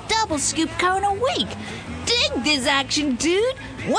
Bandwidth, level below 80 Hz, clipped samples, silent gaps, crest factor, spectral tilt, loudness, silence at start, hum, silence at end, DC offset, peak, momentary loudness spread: 10.5 kHz; -44 dBFS; under 0.1%; none; 16 dB; -2.5 dB/octave; -21 LUFS; 0 s; none; 0 s; under 0.1%; -6 dBFS; 9 LU